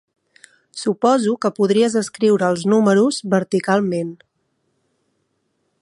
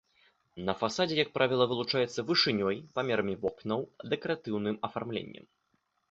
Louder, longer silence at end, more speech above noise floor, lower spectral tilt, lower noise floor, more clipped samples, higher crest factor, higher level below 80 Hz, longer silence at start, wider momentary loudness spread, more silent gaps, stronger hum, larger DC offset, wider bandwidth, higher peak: first, -18 LUFS vs -31 LUFS; first, 1.7 s vs 0.75 s; first, 52 dB vs 45 dB; about the same, -5.5 dB/octave vs -5 dB/octave; second, -69 dBFS vs -76 dBFS; neither; second, 16 dB vs 22 dB; about the same, -68 dBFS vs -66 dBFS; first, 0.75 s vs 0.55 s; about the same, 9 LU vs 9 LU; neither; neither; neither; first, 11.5 kHz vs 8 kHz; first, -2 dBFS vs -10 dBFS